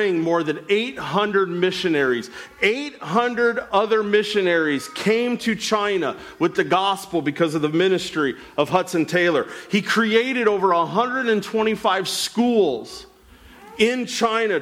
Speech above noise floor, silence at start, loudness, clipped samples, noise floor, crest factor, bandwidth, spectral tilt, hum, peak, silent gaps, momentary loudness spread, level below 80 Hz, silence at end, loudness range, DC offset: 27 dB; 0 s; -21 LUFS; under 0.1%; -48 dBFS; 16 dB; 15.5 kHz; -4.5 dB/octave; none; -6 dBFS; none; 6 LU; -60 dBFS; 0 s; 2 LU; under 0.1%